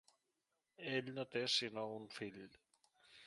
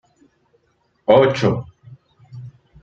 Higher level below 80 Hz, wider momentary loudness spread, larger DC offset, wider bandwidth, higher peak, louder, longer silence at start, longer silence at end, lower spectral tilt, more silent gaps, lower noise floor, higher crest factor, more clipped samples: second, -86 dBFS vs -54 dBFS; second, 15 LU vs 25 LU; neither; first, 11.5 kHz vs 7.4 kHz; second, -24 dBFS vs -2 dBFS; second, -42 LUFS vs -17 LUFS; second, 0.8 s vs 1.1 s; second, 0 s vs 0.35 s; second, -3.5 dB/octave vs -7 dB/octave; neither; first, -88 dBFS vs -64 dBFS; about the same, 22 dB vs 20 dB; neither